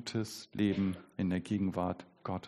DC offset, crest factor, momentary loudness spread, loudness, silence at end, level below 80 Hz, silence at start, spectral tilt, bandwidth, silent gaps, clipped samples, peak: under 0.1%; 16 dB; 9 LU; -35 LUFS; 0 s; -66 dBFS; 0 s; -6.5 dB/octave; 13 kHz; none; under 0.1%; -18 dBFS